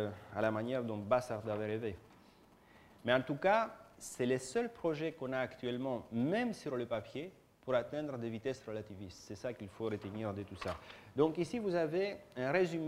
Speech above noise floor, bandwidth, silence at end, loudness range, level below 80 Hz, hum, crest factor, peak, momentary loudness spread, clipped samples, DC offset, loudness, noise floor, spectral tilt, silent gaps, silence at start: 26 dB; 16 kHz; 0 s; 5 LU; -68 dBFS; none; 22 dB; -16 dBFS; 12 LU; under 0.1%; under 0.1%; -38 LUFS; -63 dBFS; -6 dB/octave; none; 0 s